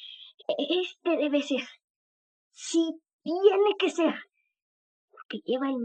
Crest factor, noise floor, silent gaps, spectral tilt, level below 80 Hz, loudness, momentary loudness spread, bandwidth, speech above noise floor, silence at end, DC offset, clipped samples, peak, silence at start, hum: 20 dB; under -90 dBFS; 0.34-0.38 s, 1.84-2.51 s, 3.13-3.19 s, 4.62-5.08 s, 5.25-5.29 s; -3 dB/octave; -90 dBFS; -27 LUFS; 17 LU; 9 kHz; over 63 dB; 0 s; under 0.1%; under 0.1%; -8 dBFS; 0 s; none